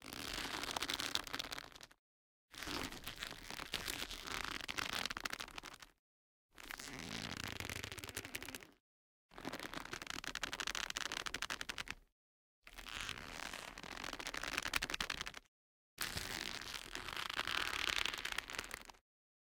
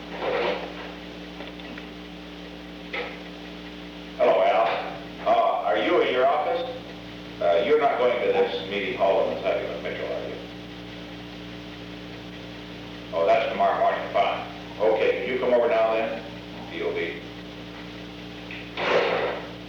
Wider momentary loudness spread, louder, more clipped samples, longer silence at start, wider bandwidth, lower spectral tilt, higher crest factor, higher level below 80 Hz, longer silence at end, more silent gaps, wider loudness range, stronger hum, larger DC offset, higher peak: second, 13 LU vs 17 LU; second, -43 LUFS vs -24 LUFS; neither; about the same, 0 s vs 0 s; first, 18 kHz vs 7.8 kHz; second, -1.5 dB/octave vs -5.5 dB/octave; first, 32 dB vs 16 dB; second, -62 dBFS vs -54 dBFS; first, 0.55 s vs 0 s; first, 1.99-2.48 s, 5.99-6.49 s, 8.80-9.29 s, 12.12-12.62 s, 15.48-15.97 s vs none; second, 6 LU vs 10 LU; second, none vs 60 Hz at -55 dBFS; neither; second, -14 dBFS vs -10 dBFS